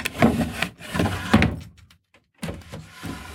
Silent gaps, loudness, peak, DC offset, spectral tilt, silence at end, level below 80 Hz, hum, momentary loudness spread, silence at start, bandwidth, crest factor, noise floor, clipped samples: none; -23 LUFS; -2 dBFS; under 0.1%; -5.5 dB/octave; 0 s; -40 dBFS; none; 17 LU; 0 s; 18 kHz; 22 dB; -60 dBFS; under 0.1%